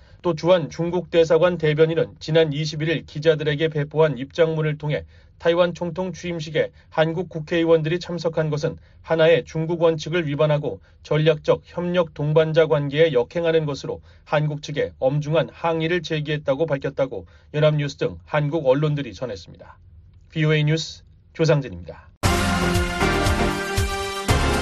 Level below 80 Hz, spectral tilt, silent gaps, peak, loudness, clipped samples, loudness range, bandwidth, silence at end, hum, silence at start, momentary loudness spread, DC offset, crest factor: -38 dBFS; -6 dB/octave; 22.17-22.21 s; -4 dBFS; -22 LUFS; under 0.1%; 3 LU; 13 kHz; 0 s; none; 0.25 s; 9 LU; under 0.1%; 16 dB